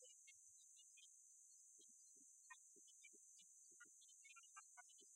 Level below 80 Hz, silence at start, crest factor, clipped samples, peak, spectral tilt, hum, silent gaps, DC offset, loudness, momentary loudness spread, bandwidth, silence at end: under -90 dBFS; 0 s; 18 dB; under 0.1%; -50 dBFS; 2 dB/octave; none; none; under 0.1%; -65 LUFS; 3 LU; 13.5 kHz; 0 s